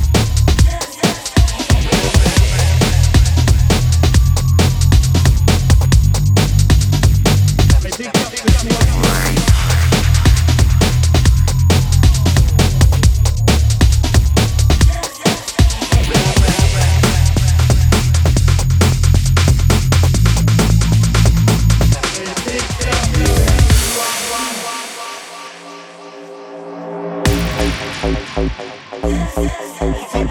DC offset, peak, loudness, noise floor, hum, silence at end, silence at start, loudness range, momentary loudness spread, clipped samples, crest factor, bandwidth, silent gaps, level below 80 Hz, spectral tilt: under 0.1%; 0 dBFS; -14 LUFS; -34 dBFS; none; 0 s; 0 s; 7 LU; 9 LU; under 0.1%; 12 dB; 19.5 kHz; none; -16 dBFS; -5 dB/octave